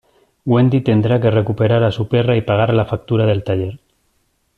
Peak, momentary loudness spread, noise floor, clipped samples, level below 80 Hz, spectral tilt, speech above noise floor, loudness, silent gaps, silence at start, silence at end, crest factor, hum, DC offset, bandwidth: -2 dBFS; 6 LU; -63 dBFS; under 0.1%; -46 dBFS; -9.5 dB/octave; 49 dB; -16 LUFS; none; 0.45 s; 0.8 s; 14 dB; none; under 0.1%; 4.6 kHz